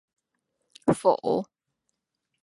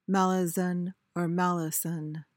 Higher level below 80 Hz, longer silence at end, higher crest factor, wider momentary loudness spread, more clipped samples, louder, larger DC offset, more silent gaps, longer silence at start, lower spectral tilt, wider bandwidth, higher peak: first, -62 dBFS vs -80 dBFS; first, 1 s vs 0.15 s; first, 22 dB vs 16 dB; about the same, 8 LU vs 8 LU; neither; first, -26 LUFS vs -29 LUFS; neither; neither; first, 0.85 s vs 0.1 s; about the same, -6.5 dB/octave vs -5.5 dB/octave; second, 11.5 kHz vs 17 kHz; first, -8 dBFS vs -14 dBFS